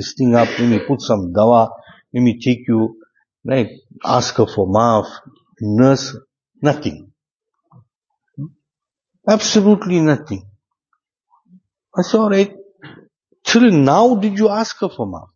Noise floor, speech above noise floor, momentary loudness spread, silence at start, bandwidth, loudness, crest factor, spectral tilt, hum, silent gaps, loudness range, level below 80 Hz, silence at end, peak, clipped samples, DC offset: -85 dBFS; 70 dB; 15 LU; 0 s; 7.4 kHz; -16 LUFS; 16 dB; -6 dB/octave; none; 7.31-7.40 s, 7.96-8.01 s; 6 LU; -56 dBFS; 0.15 s; 0 dBFS; under 0.1%; under 0.1%